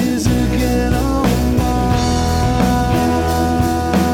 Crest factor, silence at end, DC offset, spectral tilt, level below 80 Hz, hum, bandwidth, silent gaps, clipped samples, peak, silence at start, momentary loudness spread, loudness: 14 dB; 0 s; under 0.1%; -6 dB/octave; -22 dBFS; none; 17.5 kHz; none; under 0.1%; -2 dBFS; 0 s; 1 LU; -16 LUFS